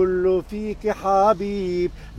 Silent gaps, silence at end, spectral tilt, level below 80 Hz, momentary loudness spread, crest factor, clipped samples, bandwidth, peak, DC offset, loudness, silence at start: none; 0 s; -7 dB/octave; -40 dBFS; 8 LU; 14 dB; under 0.1%; 12 kHz; -6 dBFS; under 0.1%; -22 LUFS; 0 s